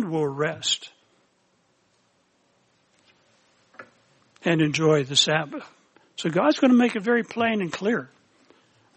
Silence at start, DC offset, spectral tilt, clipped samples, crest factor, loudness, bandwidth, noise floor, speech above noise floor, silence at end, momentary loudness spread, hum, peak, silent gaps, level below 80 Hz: 0 s; under 0.1%; -4.5 dB/octave; under 0.1%; 20 dB; -23 LUFS; 8.4 kHz; -66 dBFS; 44 dB; 0.9 s; 12 LU; none; -6 dBFS; none; -70 dBFS